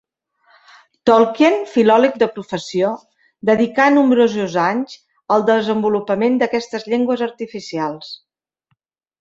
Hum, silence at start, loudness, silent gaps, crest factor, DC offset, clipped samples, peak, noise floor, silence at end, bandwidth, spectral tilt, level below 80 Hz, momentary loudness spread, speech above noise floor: none; 1.05 s; -17 LUFS; none; 16 dB; under 0.1%; under 0.1%; -2 dBFS; -69 dBFS; 1.05 s; 7.8 kHz; -5.5 dB/octave; -62 dBFS; 13 LU; 53 dB